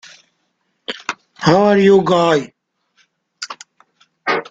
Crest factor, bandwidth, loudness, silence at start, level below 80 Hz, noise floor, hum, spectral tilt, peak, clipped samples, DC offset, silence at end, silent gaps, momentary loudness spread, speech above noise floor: 18 dB; 7.8 kHz; -15 LUFS; 0.9 s; -54 dBFS; -68 dBFS; none; -5.5 dB/octave; 0 dBFS; under 0.1%; under 0.1%; 0.05 s; none; 20 LU; 56 dB